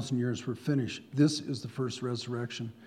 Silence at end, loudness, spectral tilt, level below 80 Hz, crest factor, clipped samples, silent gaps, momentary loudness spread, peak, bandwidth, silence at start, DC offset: 0 s; -32 LUFS; -6 dB/octave; -76 dBFS; 18 dB; under 0.1%; none; 8 LU; -14 dBFS; 13 kHz; 0 s; under 0.1%